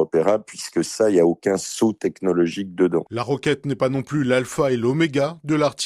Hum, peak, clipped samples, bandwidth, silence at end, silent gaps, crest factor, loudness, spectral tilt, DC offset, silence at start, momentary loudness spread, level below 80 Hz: none; -4 dBFS; under 0.1%; 14 kHz; 0 s; none; 16 dB; -21 LUFS; -5.5 dB/octave; under 0.1%; 0 s; 6 LU; -58 dBFS